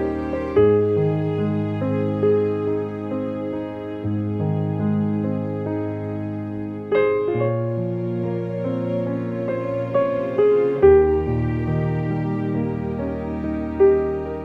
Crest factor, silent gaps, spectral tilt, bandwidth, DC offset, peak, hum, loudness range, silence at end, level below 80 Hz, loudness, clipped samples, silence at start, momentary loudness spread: 18 dB; none; -10.5 dB/octave; 4.8 kHz; under 0.1%; -4 dBFS; none; 5 LU; 0 s; -42 dBFS; -22 LUFS; under 0.1%; 0 s; 10 LU